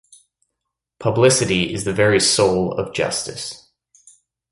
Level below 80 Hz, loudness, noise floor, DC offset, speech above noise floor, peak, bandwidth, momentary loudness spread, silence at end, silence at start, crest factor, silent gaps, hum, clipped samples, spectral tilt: -48 dBFS; -18 LUFS; -80 dBFS; under 0.1%; 63 dB; -2 dBFS; 11.5 kHz; 12 LU; 0.95 s; 1 s; 18 dB; none; none; under 0.1%; -3.5 dB/octave